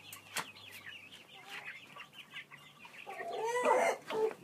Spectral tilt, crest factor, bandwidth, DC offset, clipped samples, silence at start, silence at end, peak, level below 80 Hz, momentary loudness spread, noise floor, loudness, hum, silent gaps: -2 dB/octave; 22 dB; 15.5 kHz; under 0.1%; under 0.1%; 0 s; 0 s; -18 dBFS; under -90 dBFS; 21 LU; -56 dBFS; -37 LUFS; none; none